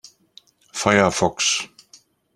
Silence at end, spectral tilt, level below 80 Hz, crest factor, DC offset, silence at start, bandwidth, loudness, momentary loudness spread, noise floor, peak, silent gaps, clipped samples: 0.7 s; -3 dB/octave; -54 dBFS; 22 dB; under 0.1%; 0.75 s; 14 kHz; -19 LUFS; 15 LU; -54 dBFS; -2 dBFS; none; under 0.1%